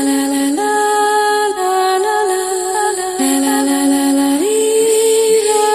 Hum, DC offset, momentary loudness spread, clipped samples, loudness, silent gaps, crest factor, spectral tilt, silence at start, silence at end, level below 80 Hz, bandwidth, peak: none; under 0.1%; 4 LU; under 0.1%; -14 LUFS; none; 12 dB; -1.5 dB/octave; 0 s; 0 s; -56 dBFS; 14 kHz; -2 dBFS